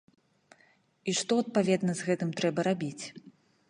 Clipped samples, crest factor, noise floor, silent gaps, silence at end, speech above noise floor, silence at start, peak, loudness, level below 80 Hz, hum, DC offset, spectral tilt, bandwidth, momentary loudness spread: under 0.1%; 18 dB; -66 dBFS; none; 0.4 s; 37 dB; 1.05 s; -12 dBFS; -30 LUFS; -76 dBFS; none; under 0.1%; -5 dB/octave; 11 kHz; 11 LU